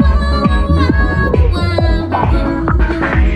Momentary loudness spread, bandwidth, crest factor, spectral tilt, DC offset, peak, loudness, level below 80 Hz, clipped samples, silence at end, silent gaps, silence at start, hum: 2 LU; 9 kHz; 12 dB; -8 dB/octave; under 0.1%; 0 dBFS; -14 LUFS; -14 dBFS; under 0.1%; 0 s; none; 0 s; none